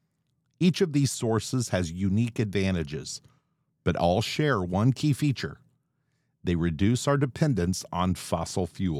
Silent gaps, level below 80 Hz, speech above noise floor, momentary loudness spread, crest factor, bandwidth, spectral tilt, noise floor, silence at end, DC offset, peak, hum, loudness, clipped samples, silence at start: none; -50 dBFS; 48 dB; 8 LU; 18 dB; 15 kHz; -6 dB/octave; -74 dBFS; 0 s; under 0.1%; -10 dBFS; none; -27 LUFS; under 0.1%; 0.6 s